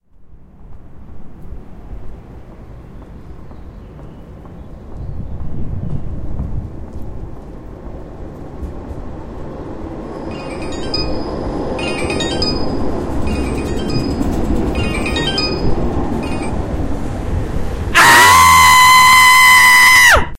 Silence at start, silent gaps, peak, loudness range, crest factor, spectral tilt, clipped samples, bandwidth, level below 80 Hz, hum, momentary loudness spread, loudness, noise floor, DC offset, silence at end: 0.2 s; none; 0 dBFS; 25 LU; 14 dB; -2.5 dB/octave; under 0.1%; 16 kHz; -28 dBFS; none; 26 LU; -11 LUFS; -38 dBFS; under 0.1%; 0 s